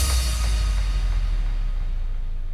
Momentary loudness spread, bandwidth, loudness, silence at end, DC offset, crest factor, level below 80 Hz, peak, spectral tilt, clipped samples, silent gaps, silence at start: 9 LU; 14.5 kHz; -27 LUFS; 0 s; under 0.1%; 10 dB; -22 dBFS; -12 dBFS; -3.5 dB/octave; under 0.1%; none; 0 s